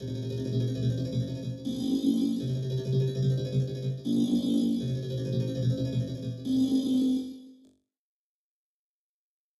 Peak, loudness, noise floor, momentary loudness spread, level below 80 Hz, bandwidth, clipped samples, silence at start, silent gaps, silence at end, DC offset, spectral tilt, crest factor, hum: -14 dBFS; -29 LUFS; under -90 dBFS; 8 LU; -56 dBFS; 12 kHz; under 0.1%; 0 s; none; 2.05 s; under 0.1%; -8 dB/octave; 16 dB; none